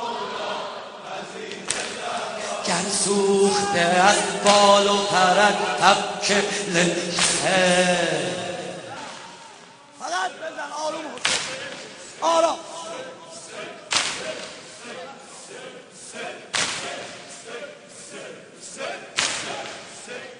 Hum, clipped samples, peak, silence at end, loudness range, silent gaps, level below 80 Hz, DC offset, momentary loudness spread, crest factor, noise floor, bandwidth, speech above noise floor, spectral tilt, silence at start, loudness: none; under 0.1%; 0 dBFS; 0 s; 13 LU; none; -62 dBFS; under 0.1%; 20 LU; 24 dB; -46 dBFS; 10.5 kHz; 27 dB; -2.5 dB/octave; 0 s; -21 LUFS